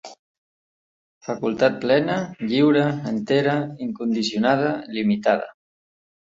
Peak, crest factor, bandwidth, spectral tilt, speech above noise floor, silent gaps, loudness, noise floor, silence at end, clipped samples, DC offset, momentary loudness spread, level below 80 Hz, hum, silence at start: -2 dBFS; 20 dB; 7.8 kHz; -6.5 dB/octave; over 69 dB; 0.19-1.21 s; -22 LUFS; under -90 dBFS; 0.9 s; under 0.1%; under 0.1%; 9 LU; -64 dBFS; none; 0.05 s